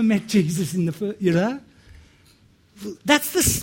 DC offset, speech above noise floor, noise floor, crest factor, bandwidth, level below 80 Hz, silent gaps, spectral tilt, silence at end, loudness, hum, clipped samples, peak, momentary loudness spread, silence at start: under 0.1%; 35 dB; -56 dBFS; 20 dB; 16.5 kHz; -44 dBFS; none; -4.5 dB/octave; 0 s; -21 LUFS; none; under 0.1%; -2 dBFS; 15 LU; 0 s